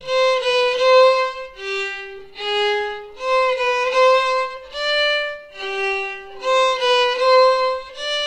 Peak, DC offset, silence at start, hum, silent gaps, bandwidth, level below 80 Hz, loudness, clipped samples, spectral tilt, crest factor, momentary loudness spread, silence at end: -4 dBFS; 0.4%; 0 s; none; none; 9.4 kHz; -54 dBFS; -18 LUFS; under 0.1%; -0.5 dB/octave; 14 dB; 13 LU; 0 s